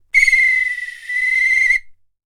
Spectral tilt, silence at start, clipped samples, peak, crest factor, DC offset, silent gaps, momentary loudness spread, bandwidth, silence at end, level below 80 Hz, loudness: 3 dB/octave; 0.15 s; under 0.1%; 0 dBFS; 16 dB; under 0.1%; none; 10 LU; 16 kHz; 0.4 s; -44 dBFS; -14 LUFS